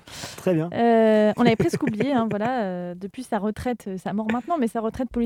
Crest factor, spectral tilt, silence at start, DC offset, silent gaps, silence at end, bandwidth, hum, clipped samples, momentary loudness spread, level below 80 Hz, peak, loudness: 18 dB; -6.5 dB/octave; 0.05 s; under 0.1%; none; 0 s; 15.5 kHz; none; under 0.1%; 11 LU; -52 dBFS; -4 dBFS; -23 LUFS